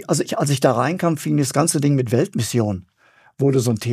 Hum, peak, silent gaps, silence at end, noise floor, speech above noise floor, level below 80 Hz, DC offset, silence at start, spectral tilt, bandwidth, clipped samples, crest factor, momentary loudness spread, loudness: none; -2 dBFS; none; 0 s; -55 dBFS; 36 dB; -60 dBFS; under 0.1%; 0 s; -5.5 dB/octave; 15.5 kHz; under 0.1%; 18 dB; 4 LU; -19 LUFS